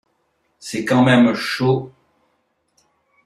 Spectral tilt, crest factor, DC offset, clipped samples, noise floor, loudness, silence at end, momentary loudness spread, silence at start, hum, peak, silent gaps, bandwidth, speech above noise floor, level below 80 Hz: -6 dB/octave; 18 dB; under 0.1%; under 0.1%; -67 dBFS; -17 LUFS; 1.35 s; 19 LU; 0.65 s; none; -2 dBFS; none; 13 kHz; 51 dB; -58 dBFS